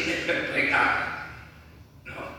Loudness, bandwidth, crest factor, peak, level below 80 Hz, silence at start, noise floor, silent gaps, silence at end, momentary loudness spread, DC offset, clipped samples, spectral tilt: -24 LUFS; 20 kHz; 18 dB; -10 dBFS; -54 dBFS; 0 s; -49 dBFS; none; 0 s; 22 LU; under 0.1%; under 0.1%; -4 dB/octave